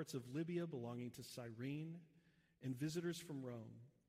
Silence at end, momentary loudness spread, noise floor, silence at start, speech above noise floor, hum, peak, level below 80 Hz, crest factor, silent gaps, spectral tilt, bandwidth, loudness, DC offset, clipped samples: 0.2 s; 9 LU; -75 dBFS; 0 s; 27 dB; none; -34 dBFS; -84 dBFS; 16 dB; none; -6 dB/octave; 15.5 kHz; -48 LUFS; under 0.1%; under 0.1%